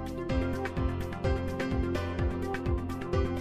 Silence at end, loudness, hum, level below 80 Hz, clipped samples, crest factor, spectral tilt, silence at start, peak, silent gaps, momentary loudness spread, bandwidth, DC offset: 0 s; -32 LUFS; none; -38 dBFS; under 0.1%; 14 dB; -7.5 dB/octave; 0 s; -16 dBFS; none; 2 LU; 14 kHz; 0.3%